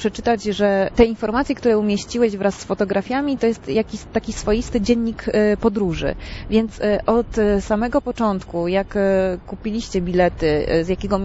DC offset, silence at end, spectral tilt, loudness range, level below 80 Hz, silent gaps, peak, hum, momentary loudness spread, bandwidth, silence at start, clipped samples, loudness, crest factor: under 0.1%; 0 s; -6 dB/octave; 2 LU; -36 dBFS; none; -2 dBFS; none; 6 LU; 8 kHz; 0 s; under 0.1%; -20 LUFS; 16 dB